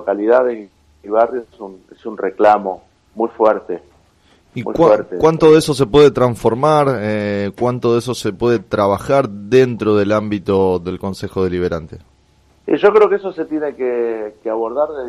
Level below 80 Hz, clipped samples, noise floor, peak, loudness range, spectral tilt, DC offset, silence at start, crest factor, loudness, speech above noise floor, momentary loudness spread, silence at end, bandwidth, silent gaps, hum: -48 dBFS; under 0.1%; -53 dBFS; 0 dBFS; 5 LU; -6.5 dB/octave; under 0.1%; 0 s; 16 dB; -15 LUFS; 38 dB; 15 LU; 0 s; 12.5 kHz; none; none